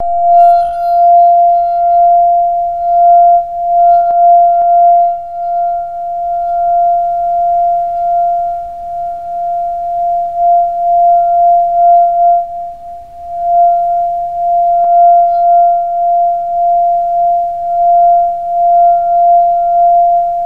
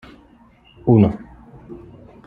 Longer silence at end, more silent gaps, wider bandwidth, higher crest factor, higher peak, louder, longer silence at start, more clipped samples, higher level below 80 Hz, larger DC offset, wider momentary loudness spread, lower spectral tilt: second, 0 s vs 0.5 s; neither; second, 1.5 kHz vs 4.5 kHz; second, 10 dB vs 20 dB; about the same, 0 dBFS vs -2 dBFS; first, -10 LUFS vs -17 LUFS; second, 0 s vs 0.85 s; neither; about the same, -44 dBFS vs -46 dBFS; first, 1% vs under 0.1%; second, 10 LU vs 25 LU; second, -6 dB/octave vs -11.5 dB/octave